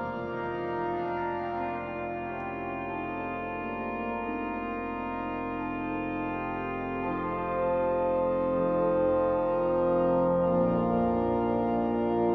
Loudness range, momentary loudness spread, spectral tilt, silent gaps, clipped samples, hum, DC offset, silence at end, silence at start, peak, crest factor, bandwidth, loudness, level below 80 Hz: 7 LU; 8 LU; -10 dB/octave; none; under 0.1%; none; under 0.1%; 0 s; 0 s; -16 dBFS; 14 dB; 4.9 kHz; -29 LUFS; -52 dBFS